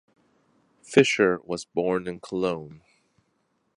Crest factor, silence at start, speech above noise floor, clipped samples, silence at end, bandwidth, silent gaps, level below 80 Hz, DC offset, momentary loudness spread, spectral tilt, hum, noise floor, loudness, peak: 24 dB; 0.9 s; 48 dB; under 0.1%; 1 s; 11 kHz; none; -64 dBFS; under 0.1%; 12 LU; -5 dB/octave; none; -72 dBFS; -25 LUFS; -4 dBFS